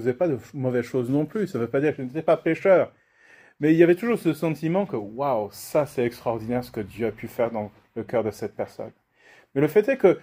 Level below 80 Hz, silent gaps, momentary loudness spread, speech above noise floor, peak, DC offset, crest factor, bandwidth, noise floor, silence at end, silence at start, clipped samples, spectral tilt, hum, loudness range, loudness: -62 dBFS; none; 13 LU; 32 dB; -4 dBFS; under 0.1%; 20 dB; 16 kHz; -56 dBFS; 0.05 s; 0 s; under 0.1%; -7.5 dB/octave; none; 6 LU; -24 LUFS